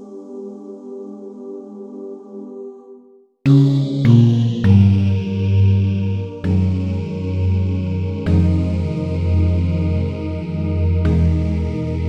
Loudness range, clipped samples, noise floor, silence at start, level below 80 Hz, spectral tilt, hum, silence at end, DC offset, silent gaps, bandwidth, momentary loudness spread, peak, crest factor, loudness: 6 LU; under 0.1%; -47 dBFS; 0 s; -32 dBFS; -9.5 dB/octave; none; 0 s; under 0.1%; none; 6.2 kHz; 20 LU; 0 dBFS; 16 dB; -17 LUFS